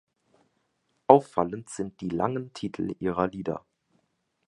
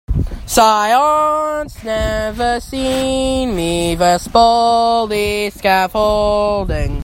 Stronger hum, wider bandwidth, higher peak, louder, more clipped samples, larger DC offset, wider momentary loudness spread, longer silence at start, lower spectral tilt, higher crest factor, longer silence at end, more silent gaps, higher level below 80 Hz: neither; second, 11.5 kHz vs 16.5 kHz; about the same, 0 dBFS vs 0 dBFS; second, -27 LUFS vs -15 LUFS; neither; neither; first, 16 LU vs 8 LU; first, 1.1 s vs 0.1 s; first, -7 dB/octave vs -4.5 dB/octave; first, 28 dB vs 14 dB; first, 0.9 s vs 0 s; neither; second, -60 dBFS vs -28 dBFS